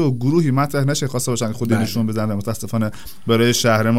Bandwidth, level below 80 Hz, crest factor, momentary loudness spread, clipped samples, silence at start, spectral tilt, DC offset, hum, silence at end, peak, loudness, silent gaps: 16 kHz; -50 dBFS; 16 dB; 8 LU; under 0.1%; 0 s; -5.5 dB/octave; 3%; none; 0 s; -2 dBFS; -19 LUFS; none